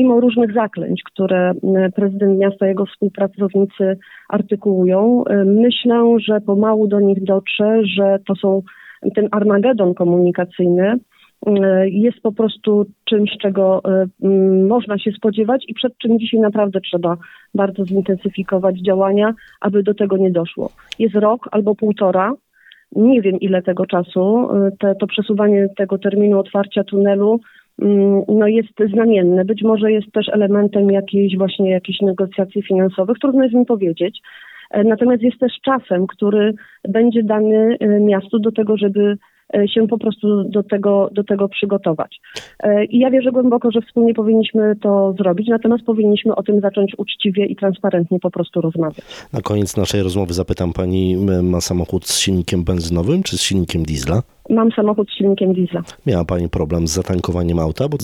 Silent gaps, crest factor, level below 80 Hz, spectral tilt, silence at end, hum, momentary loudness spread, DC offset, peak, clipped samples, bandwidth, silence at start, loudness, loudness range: none; 12 dB; -42 dBFS; -6.5 dB/octave; 0 s; none; 7 LU; under 0.1%; -4 dBFS; under 0.1%; 13.5 kHz; 0 s; -16 LUFS; 3 LU